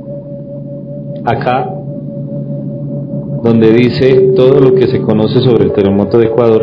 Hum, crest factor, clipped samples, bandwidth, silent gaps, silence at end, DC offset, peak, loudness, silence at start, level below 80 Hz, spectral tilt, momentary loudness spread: none; 10 dB; 1%; 6 kHz; none; 0 s; under 0.1%; 0 dBFS; -10 LUFS; 0 s; -44 dBFS; -10 dB/octave; 17 LU